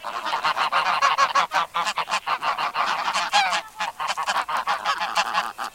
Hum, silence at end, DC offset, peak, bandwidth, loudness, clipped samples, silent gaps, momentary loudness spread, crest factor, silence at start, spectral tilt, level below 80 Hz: none; 0.05 s; under 0.1%; -4 dBFS; 17 kHz; -23 LUFS; under 0.1%; none; 6 LU; 20 dB; 0 s; 0 dB/octave; -66 dBFS